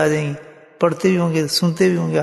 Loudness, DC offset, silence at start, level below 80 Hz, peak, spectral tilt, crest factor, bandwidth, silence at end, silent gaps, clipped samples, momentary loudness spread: -18 LUFS; under 0.1%; 0 s; -60 dBFS; -2 dBFS; -5.5 dB/octave; 16 dB; 12.5 kHz; 0 s; none; under 0.1%; 7 LU